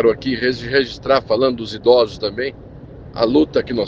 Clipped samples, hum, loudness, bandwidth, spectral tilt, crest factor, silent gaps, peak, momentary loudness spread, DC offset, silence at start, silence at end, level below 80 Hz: under 0.1%; none; -18 LUFS; 7.6 kHz; -6.5 dB/octave; 18 dB; none; 0 dBFS; 10 LU; under 0.1%; 0 s; 0 s; -44 dBFS